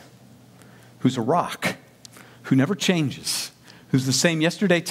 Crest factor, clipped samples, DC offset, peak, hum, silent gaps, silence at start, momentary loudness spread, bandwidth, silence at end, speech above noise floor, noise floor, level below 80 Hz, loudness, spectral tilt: 20 dB; under 0.1%; under 0.1%; -4 dBFS; none; none; 1 s; 8 LU; 16.5 kHz; 0 s; 28 dB; -50 dBFS; -66 dBFS; -23 LUFS; -4.5 dB/octave